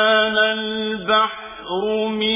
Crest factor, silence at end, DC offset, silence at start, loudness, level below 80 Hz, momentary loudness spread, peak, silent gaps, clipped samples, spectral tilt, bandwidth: 16 dB; 0 s; under 0.1%; 0 s; -19 LUFS; -56 dBFS; 9 LU; -4 dBFS; none; under 0.1%; -7.5 dB/octave; 3.9 kHz